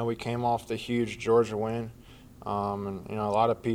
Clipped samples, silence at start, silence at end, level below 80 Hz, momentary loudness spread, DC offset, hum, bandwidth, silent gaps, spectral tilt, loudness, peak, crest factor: under 0.1%; 0 s; 0 s; -56 dBFS; 10 LU; under 0.1%; none; 15.5 kHz; none; -6.5 dB/octave; -29 LUFS; -12 dBFS; 18 dB